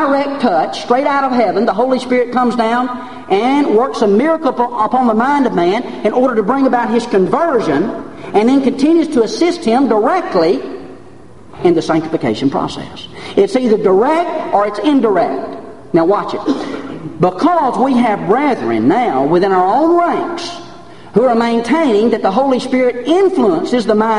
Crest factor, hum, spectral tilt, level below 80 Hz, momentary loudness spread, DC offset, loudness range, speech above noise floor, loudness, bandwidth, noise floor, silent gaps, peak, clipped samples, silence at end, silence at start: 14 dB; none; -6 dB/octave; -50 dBFS; 7 LU; 1%; 2 LU; 26 dB; -13 LUFS; 11 kHz; -38 dBFS; none; 0 dBFS; under 0.1%; 0 s; 0 s